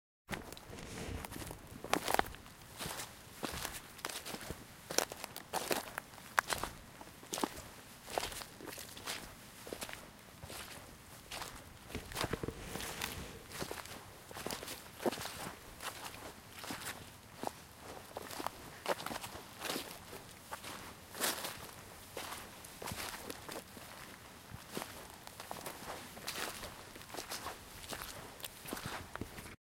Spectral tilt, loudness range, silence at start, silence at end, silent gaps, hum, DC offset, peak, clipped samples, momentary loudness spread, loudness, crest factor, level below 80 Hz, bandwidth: -2.5 dB/octave; 7 LU; 0.3 s; 0.2 s; none; none; under 0.1%; -6 dBFS; under 0.1%; 13 LU; -43 LUFS; 38 dB; -60 dBFS; 17 kHz